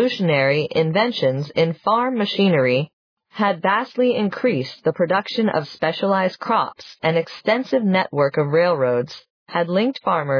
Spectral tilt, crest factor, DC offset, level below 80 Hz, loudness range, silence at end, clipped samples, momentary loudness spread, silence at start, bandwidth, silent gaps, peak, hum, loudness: -7.5 dB/octave; 14 dB; under 0.1%; -68 dBFS; 1 LU; 0 s; under 0.1%; 6 LU; 0 s; 5.4 kHz; 2.93-3.17 s, 9.30-9.46 s; -6 dBFS; none; -20 LUFS